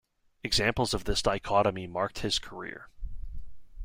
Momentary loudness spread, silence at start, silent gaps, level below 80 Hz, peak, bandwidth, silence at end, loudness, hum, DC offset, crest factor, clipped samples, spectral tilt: 20 LU; 0.45 s; none; -42 dBFS; -12 dBFS; 16.5 kHz; 0 s; -29 LUFS; none; under 0.1%; 20 dB; under 0.1%; -3.5 dB/octave